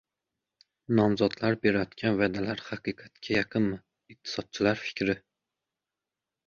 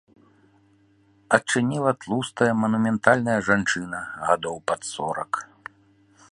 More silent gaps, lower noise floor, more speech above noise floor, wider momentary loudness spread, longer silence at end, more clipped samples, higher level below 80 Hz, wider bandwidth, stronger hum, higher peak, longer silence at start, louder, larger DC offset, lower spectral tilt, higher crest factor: neither; first, -89 dBFS vs -60 dBFS; first, 61 dB vs 37 dB; about the same, 11 LU vs 11 LU; first, 1.3 s vs 0.9 s; neither; about the same, -60 dBFS vs -60 dBFS; second, 7.2 kHz vs 11.5 kHz; neither; second, -10 dBFS vs 0 dBFS; second, 0.9 s vs 1.3 s; second, -29 LUFS vs -23 LUFS; neither; first, -6.5 dB/octave vs -5 dB/octave; about the same, 20 dB vs 24 dB